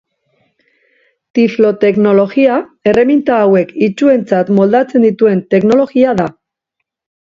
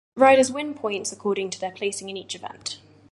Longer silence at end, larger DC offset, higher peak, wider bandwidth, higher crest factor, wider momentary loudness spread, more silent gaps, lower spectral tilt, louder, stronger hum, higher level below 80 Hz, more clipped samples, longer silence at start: first, 1.1 s vs 0.35 s; neither; first, 0 dBFS vs -4 dBFS; second, 7.6 kHz vs 11.5 kHz; second, 12 dB vs 20 dB; second, 4 LU vs 17 LU; neither; first, -8 dB/octave vs -3 dB/octave; first, -11 LUFS vs -24 LUFS; neither; first, -52 dBFS vs -66 dBFS; neither; first, 1.35 s vs 0.15 s